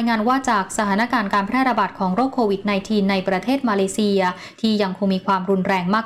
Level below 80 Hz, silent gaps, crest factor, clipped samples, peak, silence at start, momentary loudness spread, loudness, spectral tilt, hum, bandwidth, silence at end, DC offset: -54 dBFS; none; 10 dB; under 0.1%; -8 dBFS; 0 s; 2 LU; -20 LUFS; -5.5 dB/octave; none; 14.5 kHz; 0 s; 0.2%